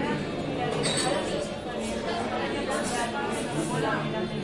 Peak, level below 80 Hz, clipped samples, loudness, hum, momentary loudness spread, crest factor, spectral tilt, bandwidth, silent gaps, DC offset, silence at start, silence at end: -12 dBFS; -50 dBFS; under 0.1%; -29 LUFS; none; 5 LU; 16 dB; -4 dB/octave; 11.5 kHz; none; under 0.1%; 0 s; 0 s